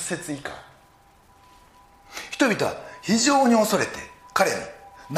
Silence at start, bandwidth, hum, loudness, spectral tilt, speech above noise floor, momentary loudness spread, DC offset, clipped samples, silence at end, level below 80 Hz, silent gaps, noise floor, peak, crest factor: 0 s; 15.5 kHz; none; -23 LUFS; -3.5 dB/octave; 33 dB; 20 LU; under 0.1%; under 0.1%; 0 s; -60 dBFS; none; -55 dBFS; -4 dBFS; 20 dB